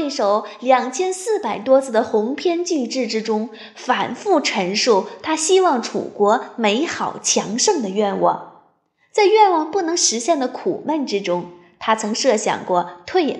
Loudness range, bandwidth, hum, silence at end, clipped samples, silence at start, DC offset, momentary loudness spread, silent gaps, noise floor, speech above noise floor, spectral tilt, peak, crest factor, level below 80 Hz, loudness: 2 LU; 12 kHz; none; 0 s; under 0.1%; 0 s; under 0.1%; 8 LU; none; -61 dBFS; 42 dB; -3 dB/octave; -2 dBFS; 16 dB; -70 dBFS; -19 LUFS